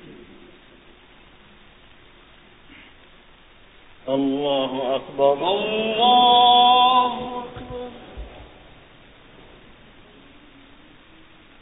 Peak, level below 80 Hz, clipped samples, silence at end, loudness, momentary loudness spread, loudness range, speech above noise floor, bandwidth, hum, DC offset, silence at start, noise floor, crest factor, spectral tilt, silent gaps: -4 dBFS; -52 dBFS; under 0.1%; 3.15 s; -18 LUFS; 24 LU; 17 LU; 31 dB; 4 kHz; none; under 0.1%; 0.05 s; -50 dBFS; 18 dB; -8.5 dB/octave; none